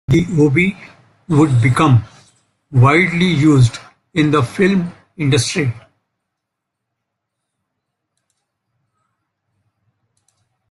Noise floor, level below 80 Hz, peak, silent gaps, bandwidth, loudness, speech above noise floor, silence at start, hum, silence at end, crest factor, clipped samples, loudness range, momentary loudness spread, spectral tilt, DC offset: -78 dBFS; -46 dBFS; 0 dBFS; none; 11.5 kHz; -14 LUFS; 65 dB; 0.1 s; none; 4.9 s; 16 dB; under 0.1%; 9 LU; 11 LU; -6.5 dB/octave; under 0.1%